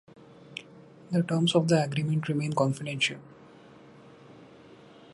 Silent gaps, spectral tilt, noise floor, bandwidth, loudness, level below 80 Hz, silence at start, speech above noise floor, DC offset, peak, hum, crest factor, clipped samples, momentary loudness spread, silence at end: none; -5.5 dB/octave; -52 dBFS; 11.5 kHz; -27 LUFS; -70 dBFS; 0.2 s; 26 dB; under 0.1%; -10 dBFS; none; 20 dB; under 0.1%; 19 LU; 0.65 s